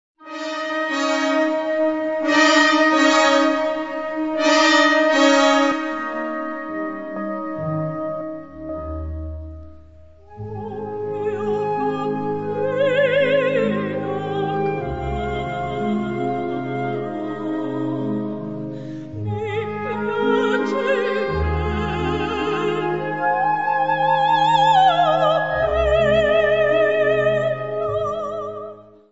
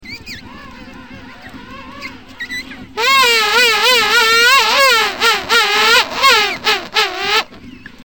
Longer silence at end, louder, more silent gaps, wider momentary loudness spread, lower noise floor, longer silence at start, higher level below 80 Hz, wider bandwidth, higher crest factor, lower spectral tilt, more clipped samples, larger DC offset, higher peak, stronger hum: about the same, 0.2 s vs 0.25 s; second, -20 LUFS vs -11 LUFS; neither; second, 15 LU vs 21 LU; first, -46 dBFS vs -36 dBFS; first, 0.2 s vs 0 s; first, -40 dBFS vs -46 dBFS; second, 8 kHz vs 17.5 kHz; about the same, 18 dB vs 14 dB; first, -5 dB/octave vs 0 dB/octave; neither; about the same, 0.4% vs 0.6%; about the same, -2 dBFS vs 0 dBFS; neither